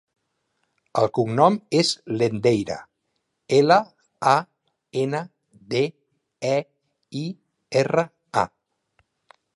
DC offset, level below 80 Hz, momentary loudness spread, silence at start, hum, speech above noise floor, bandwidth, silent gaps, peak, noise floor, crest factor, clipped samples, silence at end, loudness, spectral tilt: under 0.1%; -64 dBFS; 13 LU; 0.95 s; none; 55 dB; 11.5 kHz; none; -2 dBFS; -76 dBFS; 22 dB; under 0.1%; 1.1 s; -23 LUFS; -5.5 dB/octave